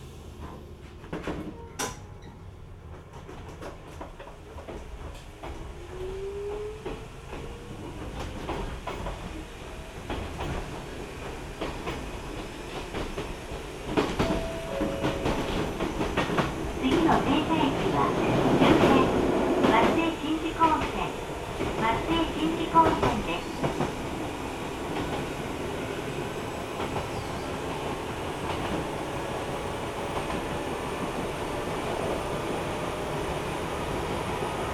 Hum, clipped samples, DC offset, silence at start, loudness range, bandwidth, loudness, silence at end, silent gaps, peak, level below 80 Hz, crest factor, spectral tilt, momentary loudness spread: none; under 0.1%; under 0.1%; 0 s; 16 LU; 18.5 kHz; -29 LUFS; 0 s; none; -8 dBFS; -42 dBFS; 22 dB; -5.5 dB/octave; 18 LU